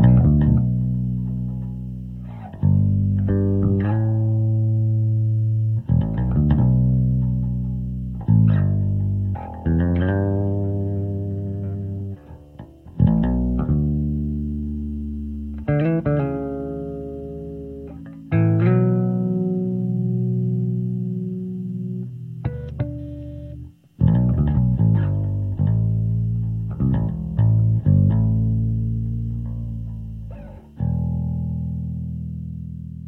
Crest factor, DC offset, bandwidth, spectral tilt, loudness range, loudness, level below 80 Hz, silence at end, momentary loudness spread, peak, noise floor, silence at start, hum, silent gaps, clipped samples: 16 dB; under 0.1%; 3.3 kHz; -12 dB/octave; 6 LU; -22 LUFS; -32 dBFS; 0 s; 15 LU; -4 dBFS; -42 dBFS; 0 s; none; none; under 0.1%